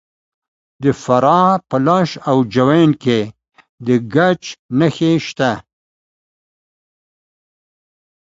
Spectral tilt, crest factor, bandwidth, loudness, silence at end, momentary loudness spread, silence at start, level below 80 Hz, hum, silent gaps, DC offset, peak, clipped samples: -7 dB/octave; 18 dB; 7.8 kHz; -15 LUFS; 2.8 s; 8 LU; 0.8 s; -54 dBFS; none; 3.69-3.78 s, 4.59-4.69 s; under 0.1%; 0 dBFS; under 0.1%